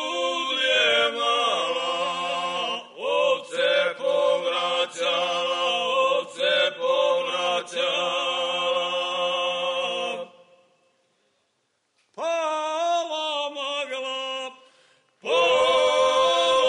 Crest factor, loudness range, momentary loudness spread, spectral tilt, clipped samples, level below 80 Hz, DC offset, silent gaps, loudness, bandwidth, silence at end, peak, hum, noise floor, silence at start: 14 dB; 7 LU; 9 LU; -1 dB/octave; under 0.1%; -72 dBFS; under 0.1%; none; -23 LUFS; 10.5 kHz; 0 s; -12 dBFS; none; -72 dBFS; 0 s